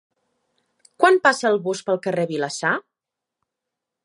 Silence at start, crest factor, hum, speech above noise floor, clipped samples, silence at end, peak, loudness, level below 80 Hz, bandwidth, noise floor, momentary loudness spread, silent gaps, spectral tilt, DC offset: 1 s; 22 dB; none; 66 dB; under 0.1%; 1.25 s; -2 dBFS; -20 LUFS; -76 dBFS; 11.5 kHz; -85 dBFS; 8 LU; none; -4 dB/octave; under 0.1%